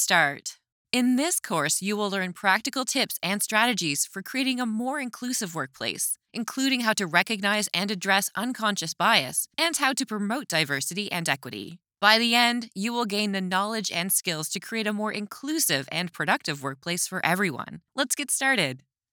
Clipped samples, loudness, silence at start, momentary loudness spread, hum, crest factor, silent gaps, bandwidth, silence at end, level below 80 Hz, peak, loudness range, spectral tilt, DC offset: under 0.1%; -25 LUFS; 0 s; 9 LU; none; 26 dB; 0.72-0.85 s; over 20 kHz; 0.35 s; -78 dBFS; -2 dBFS; 3 LU; -2.5 dB/octave; under 0.1%